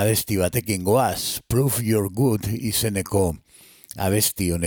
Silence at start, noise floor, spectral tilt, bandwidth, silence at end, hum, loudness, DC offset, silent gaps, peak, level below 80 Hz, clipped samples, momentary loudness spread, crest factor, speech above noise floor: 0 s; -45 dBFS; -4.5 dB/octave; 19 kHz; 0 s; none; -22 LUFS; under 0.1%; none; -6 dBFS; -44 dBFS; under 0.1%; 6 LU; 16 dB; 24 dB